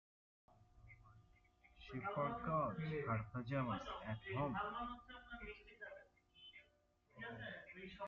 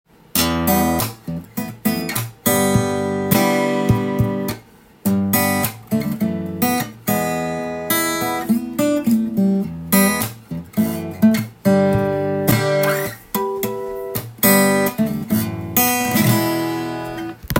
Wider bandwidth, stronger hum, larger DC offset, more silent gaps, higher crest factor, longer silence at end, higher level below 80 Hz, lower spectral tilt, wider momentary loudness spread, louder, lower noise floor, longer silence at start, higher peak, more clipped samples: second, 7.2 kHz vs 17 kHz; neither; neither; neither; about the same, 20 dB vs 18 dB; about the same, 0 s vs 0 s; second, -68 dBFS vs -46 dBFS; about the same, -5.5 dB/octave vs -5 dB/octave; first, 21 LU vs 10 LU; second, -46 LUFS vs -19 LUFS; first, -77 dBFS vs -44 dBFS; first, 0.6 s vs 0.35 s; second, -28 dBFS vs 0 dBFS; neither